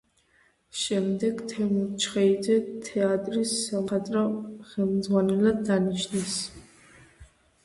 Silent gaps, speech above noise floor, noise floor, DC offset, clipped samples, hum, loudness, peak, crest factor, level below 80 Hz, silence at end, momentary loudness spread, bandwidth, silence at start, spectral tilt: none; 39 dB; -65 dBFS; under 0.1%; under 0.1%; none; -26 LUFS; -12 dBFS; 16 dB; -60 dBFS; 0.4 s; 8 LU; 11.5 kHz; 0.75 s; -5 dB/octave